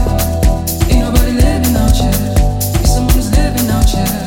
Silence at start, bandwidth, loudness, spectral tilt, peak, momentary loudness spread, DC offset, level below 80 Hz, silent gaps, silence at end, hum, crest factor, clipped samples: 0 s; 17 kHz; -13 LUFS; -5.5 dB/octave; 0 dBFS; 3 LU; under 0.1%; -14 dBFS; none; 0 s; none; 10 dB; under 0.1%